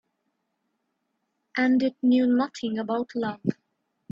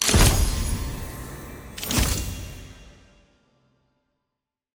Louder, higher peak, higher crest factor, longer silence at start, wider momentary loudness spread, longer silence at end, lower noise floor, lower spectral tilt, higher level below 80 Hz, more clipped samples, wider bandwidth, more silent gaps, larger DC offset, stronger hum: about the same, -25 LUFS vs -24 LUFS; second, -8 dBFS vs -4 dBFS; about the same, 18 dB vs 22 dB; first, 1.55 s vs 0 s; second, 10 LU vs 21 LU; second, 0.6 s vs 1.85 s; second, -77 dBFS vs -84 dBFS; first, -6.5 dB/octave vs -3.5 dB/octave; second, -72 dBFS vs -30 dBFS; neither; second, 7.4 kHz vs 17 kHz; neither; neither; neither